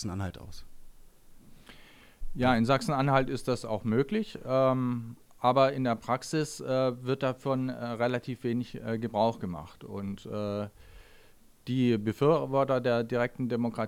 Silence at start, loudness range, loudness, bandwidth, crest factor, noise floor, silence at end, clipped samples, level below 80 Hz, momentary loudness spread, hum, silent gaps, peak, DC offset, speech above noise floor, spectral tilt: 0 s; 5 LU; -29 LUFS; 16 kHz; 20 dB; -57 dBFS; 0 s; under 0.1%; -52 dBFS; 12 LU; none; none; -10 dBFS; under 0.1%; 28 dB; -6.5 dB/octave